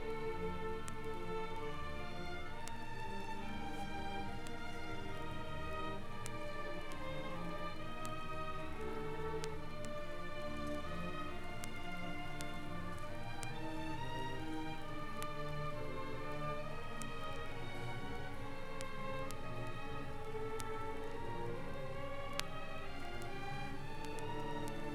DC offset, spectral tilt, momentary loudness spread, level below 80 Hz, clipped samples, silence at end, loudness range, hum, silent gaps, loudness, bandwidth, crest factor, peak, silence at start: under 0.1%; -5 dB/octave; 3 LU; -48 dBFS; under 0.1%; 0 s; 1 LU; none; none; -45 LUFS; 13 kHz; 28 dB; -14 dBFS; 0 s